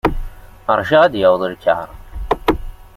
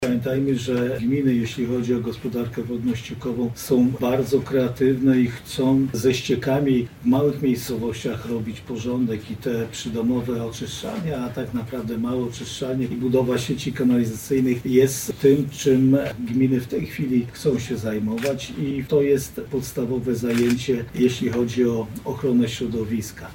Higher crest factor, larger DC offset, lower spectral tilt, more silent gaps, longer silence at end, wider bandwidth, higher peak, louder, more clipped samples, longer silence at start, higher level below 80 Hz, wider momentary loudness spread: about the same, 16 dB vs 16 dB; neither; about the same, -6.5 dB/octave vs -6.5 dB/octave; neither; about the same, 0.1 s vs 0 s; about the same, 15.5 kHz vs 17 kHz; first, 0 dBFS vs -6 dBFS; first, -16 LUFS vs -23 LUFS; neither; about the same, 0.05 s vs 0 s; first, -30 dBFS vs -48 dBFS; first, 18 LU vs 9 LU